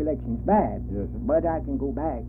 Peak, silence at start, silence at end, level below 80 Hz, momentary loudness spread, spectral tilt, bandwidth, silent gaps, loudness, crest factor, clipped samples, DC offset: -8 dBFS; 0 s; 0 s; -36 dBFS; 8 LU; -12.5 dB/octave; 2.9 kHz; none; -26 LUFS; 16 dB; under 0.1%; under 0.1%